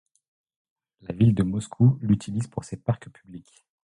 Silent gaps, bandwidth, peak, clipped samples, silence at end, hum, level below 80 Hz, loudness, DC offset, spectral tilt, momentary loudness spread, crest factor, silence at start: none; 10.5 kHz; -8 dBFS; under 0.1%; 0.55 s; none; -50 dBFS; -24 LUFS; under 0.1%; -8 dB/octave; 21 LU; 18 dB; 1.1 s